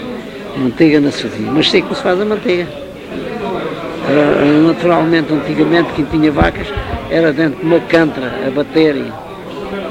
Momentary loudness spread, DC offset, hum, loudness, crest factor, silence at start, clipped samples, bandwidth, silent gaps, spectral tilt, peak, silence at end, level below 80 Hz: 14 LU; under 0.1%; none; -14 LUFS; 14 dB; 0 s; under 0.1%; 11 kHz; none; -6.5 dB/octave; 0 dBFS; 0 s; -34 dBFS